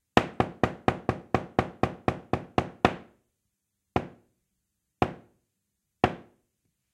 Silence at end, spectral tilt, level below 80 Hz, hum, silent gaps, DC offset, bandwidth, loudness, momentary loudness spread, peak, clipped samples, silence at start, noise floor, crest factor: 0.7 s; -6.5 dB/octave; -50 dBFS; none; none; under 0.1%; 13 kHz; -30 LUFS; 7 LU; 0 dBFS; under 0.1%; 0.15 s; -81 dBFS; 30 dB